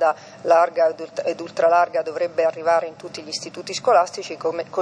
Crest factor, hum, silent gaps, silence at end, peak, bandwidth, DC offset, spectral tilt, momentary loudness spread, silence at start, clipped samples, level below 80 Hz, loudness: 16 dB; none; none; 0 s; -4 dBFS; 10.5 kHz; under 0.1%; -3 dB/octave; 12 LU; 0 s; under 0.1%; -76 dBFS; -21 LUFS